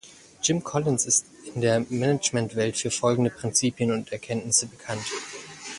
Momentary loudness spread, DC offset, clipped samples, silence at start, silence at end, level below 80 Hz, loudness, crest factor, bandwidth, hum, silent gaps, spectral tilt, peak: 10 LU; under 0.1%; under 0.1%; 0.05 s; 0 s; -60 dBFS; -25 LUFS; 20 dB; 11.5 kHz; none; none; -3.5 dB/octave; -6 dBFS